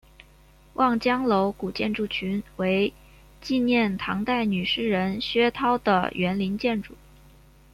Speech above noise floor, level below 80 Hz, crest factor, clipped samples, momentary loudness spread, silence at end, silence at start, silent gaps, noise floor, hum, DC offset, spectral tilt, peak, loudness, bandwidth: 30 dB; -52 dBFS; 18 dB; under 0.1%; 6 LU; 0.8 s; 0.8 s; none; -54 dBFS; none; under 0.1%; -6.5 dB/octave; -8 dBFS; -25 LUFS; 14 kHz